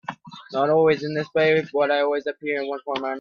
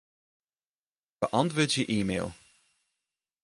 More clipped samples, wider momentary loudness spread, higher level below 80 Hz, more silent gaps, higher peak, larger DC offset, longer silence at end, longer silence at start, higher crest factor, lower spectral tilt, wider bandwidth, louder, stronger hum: neither; about the same, 10 LU vs 8 LU; second, -66 dBFS vs -60 dBFS; neither; first, -6 dBFS vs -10 dBFS; neither; second, 0 s vs 1.1 s; second, 0.1 s vs 1.2 s; second, 16 dB vs 22 dB; first, -6.5 dB/octave vs -4.5 dB/octave; second, 6.8 kHz vs 11.5 kHz; first, -22 LUFS vs -29 LUFS; neither